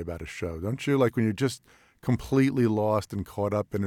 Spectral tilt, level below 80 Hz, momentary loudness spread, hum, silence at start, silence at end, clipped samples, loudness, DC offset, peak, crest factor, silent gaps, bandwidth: -7 dB/octave; -54 dBFS; 11 LU; none; 0 s; 0 s; under 0.1%; -27 LUFS; under 0.1%; -10 dBFS; 16 dB; none; 16.5 kHz